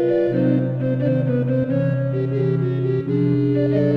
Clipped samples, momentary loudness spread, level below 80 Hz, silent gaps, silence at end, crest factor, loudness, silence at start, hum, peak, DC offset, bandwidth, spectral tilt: under 0.1%; 3 LU; -52 dBFS; none; 0 s; 12 dB; -20 LUFS; 0 s; none; -8 dBFS; under 0.1%; 4.6 kHz; -11 dB/octave